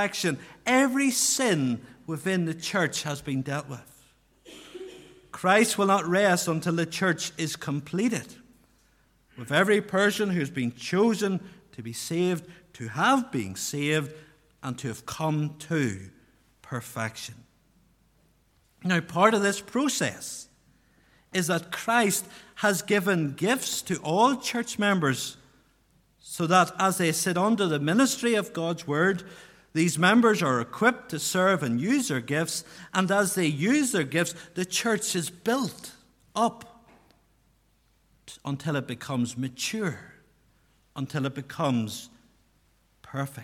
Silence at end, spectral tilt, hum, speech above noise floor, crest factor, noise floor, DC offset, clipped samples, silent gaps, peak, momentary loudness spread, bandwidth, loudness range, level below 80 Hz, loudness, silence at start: 0 s; -4 dB/octave; none; 40 dB; 22 dB; -66 dBFS; under 0.1%; under 0.1%; none; -6 dBFS; 15 LU; 17.5 kHz; 9 LU; -66 dBFS; -26 LUFS; 0 s